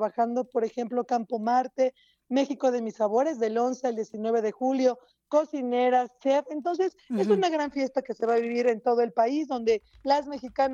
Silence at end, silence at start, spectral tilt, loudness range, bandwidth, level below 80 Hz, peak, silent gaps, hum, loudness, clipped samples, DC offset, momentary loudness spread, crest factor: 0 s; 0 s; -5.5 dB/octave; 1 LU; 7.6 kHz; -68 dBFS; -10 dBFS; none; none; -27 LUFS; under 0.1%; under 0.1%; 5 LU; 16 dB